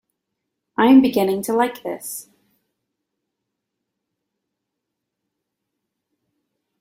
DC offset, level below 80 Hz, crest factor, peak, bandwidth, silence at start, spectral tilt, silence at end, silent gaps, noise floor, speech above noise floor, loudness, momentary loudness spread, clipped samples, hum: under 0.1%; -66 dBFS; 20 dB; -2 dBFS; 16.5 kHz; 0.8 s; -5 dB/octave; 4.6 s; none; -81 dBFS; 64 dB; -17 LUFS; 18 LU; under 0.1%; none